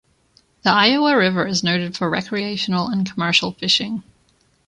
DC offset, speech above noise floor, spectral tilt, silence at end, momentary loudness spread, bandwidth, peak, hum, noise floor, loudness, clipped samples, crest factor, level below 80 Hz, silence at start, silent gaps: under 0.1%; 41 dB; -4 dB/octave; 0.65 s; 8 LU; 10.5 kHz; -2 dBFS; none; -60 dBFS; -18 LUFS; under 0.1%; 18 dB; -58 dBFS; 0.65 s; none